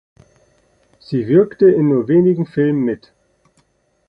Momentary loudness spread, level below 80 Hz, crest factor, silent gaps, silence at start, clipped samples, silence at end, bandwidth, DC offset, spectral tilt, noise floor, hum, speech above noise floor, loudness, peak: 11 LU; -58 dBFS; 16 dB; none; 1.1 s; under 0.1%; 1.1 s; 5.2 kHz; under 0.1%; -10.5 dB/octave; -61 dBFS; none; 47 dB; -15 LUFS; -2 dBFS